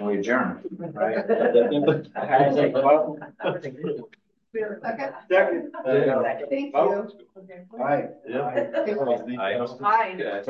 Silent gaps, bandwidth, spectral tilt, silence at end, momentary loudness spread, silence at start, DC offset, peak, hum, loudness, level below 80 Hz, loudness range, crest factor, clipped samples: none; 6.6 kHz; -7.5 dB/octave; 0 s; 12 LU; 0 s; under 0.1%; -6 dBFS; none; -24 LUFS; -74 dBFS; 4 LU; 18 dB; under 0.1%